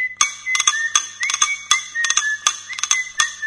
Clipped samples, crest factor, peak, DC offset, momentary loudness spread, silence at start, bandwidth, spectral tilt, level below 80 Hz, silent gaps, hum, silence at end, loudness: under 0.1%; 20 dB; 0 dBFS; under 0.1%; 4 LU; 0 s; 11 kHz; 4.5 dB/octave; -64 dBFS; none; 50 Hz at -60 dBFS; 0 s; -18 LUFS